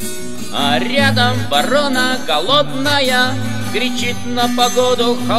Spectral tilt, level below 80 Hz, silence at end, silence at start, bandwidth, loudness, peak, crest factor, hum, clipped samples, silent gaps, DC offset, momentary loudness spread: -3.5 dB/octave; -52 dBFS; 0 s; 0 s; 16 kHz; -15 LUFS; 0 dBFS; 16 dB; none; under 0.1%; none; 8%; 7 LU